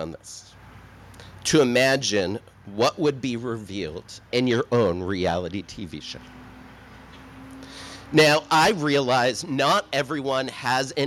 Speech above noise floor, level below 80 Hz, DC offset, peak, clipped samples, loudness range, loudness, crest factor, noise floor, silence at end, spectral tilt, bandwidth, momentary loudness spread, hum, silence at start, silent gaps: 23 dB; -54 dBFS; under 0.1%; -6 dBFS; under 0.1%; 6 LU; -22 LUFS; 18 dB; -46 dBFS; 0 s; -4 dB/octave; 16.5 kHz; 21 LU; none; 0 s; none